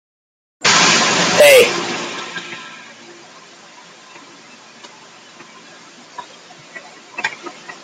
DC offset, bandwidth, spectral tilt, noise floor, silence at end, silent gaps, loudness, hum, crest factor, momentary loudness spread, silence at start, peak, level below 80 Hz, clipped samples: under 0.1%; 16 kHz; -1.5 dB/octave; -42 dBFS; 0.1 s; none; -13 LUFS; none; 18 dB; 28 LU; 0.6 s; 0 dBFS; -64 dBFS; under 0.1%